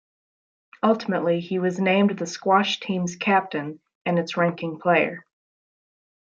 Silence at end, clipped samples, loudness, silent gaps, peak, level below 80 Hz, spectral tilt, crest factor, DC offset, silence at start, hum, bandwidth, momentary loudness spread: 1.15 s; under 0.1%; -23 LUFS; 3.95-4.05 s; -4 dBFS; -72 dBFS; -5.5 dB/octave; 20 dB; under 0.1%; 0.85 s; none; 7.8 kHz; 9 LU